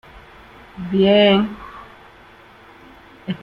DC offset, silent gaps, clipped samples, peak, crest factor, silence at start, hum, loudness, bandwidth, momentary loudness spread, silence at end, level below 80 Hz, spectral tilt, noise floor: under 0.1%; none; under 0.1%; -2 dBFS; 18 dB; 0.75 s; none; -16 LUFS; 5.4 kHz; 26 LU; 0.05 s; -50 dBFS; -8 dB/octave; -46 dBFS